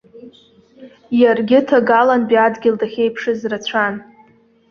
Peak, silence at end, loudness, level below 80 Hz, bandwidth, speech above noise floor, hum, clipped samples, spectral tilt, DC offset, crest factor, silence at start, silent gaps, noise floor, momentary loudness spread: -2 dBFS; 0.7 s; -15 LUFS; -60 dBFS; 6.8 kHz; 36 dB; none; under 0.1%; -5.5 dB/octave; under 0.1%; 16 dB; 0.15 s; none; -51 dBFS; 9 LU